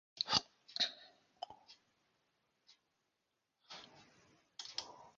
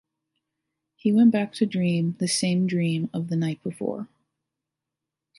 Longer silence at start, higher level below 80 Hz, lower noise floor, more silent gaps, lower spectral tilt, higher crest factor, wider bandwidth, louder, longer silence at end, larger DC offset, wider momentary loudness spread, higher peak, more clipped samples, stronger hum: second, 0.15 s vs 1.05 s; second, -78 dBFS vs -72 dBFS; about the same, -86 dBFS vs -86 dBFS; neither; second, 0.5 dB/octave vs -6 dB/octave; first, 34 dB vs 16 dB; second, 7.4 kHz vs 11.5 kHz; second, -39 LUFS vs -24 LUFS; second, 0.1 s vs 1.35 s; neither; first, 22 LU vs 12 LU; about the same, -12 dBFS vs -10 dBFS; neither; neither